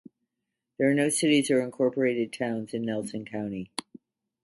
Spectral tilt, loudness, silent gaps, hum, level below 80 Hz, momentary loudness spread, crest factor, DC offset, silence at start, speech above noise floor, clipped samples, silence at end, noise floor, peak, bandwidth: -4.5 dB/octave; -27 LUFS; none; none; -70 dBFS; 12 LU; 18 dB; under 0.1%; 0.8 s; 58 dB; under 0.1%; 0.8 s; -85 dBFS; -10 dBFS; 11.5 kHz